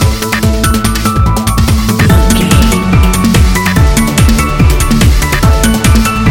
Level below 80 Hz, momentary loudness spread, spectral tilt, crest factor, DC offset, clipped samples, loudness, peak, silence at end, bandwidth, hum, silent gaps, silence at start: -12 dBFS; 3 LU; -5 dB/octave; 8 dB; under 0.1%; 0.3%; -9 LUFS; 0 dBFS; 0 s; 17.5 kHz; none; none; 0 s